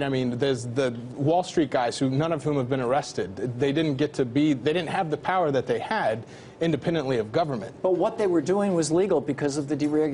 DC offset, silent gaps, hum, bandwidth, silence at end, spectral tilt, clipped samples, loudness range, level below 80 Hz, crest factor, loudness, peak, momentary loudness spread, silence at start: under 0.1%; none; none; 11 kHz; 0 s; -6 dB/octave; under 0.1%; 1 LU; -58 dBFS; 14 dB; -25 LUFS; -10 dBFS; 5 LU; 0 s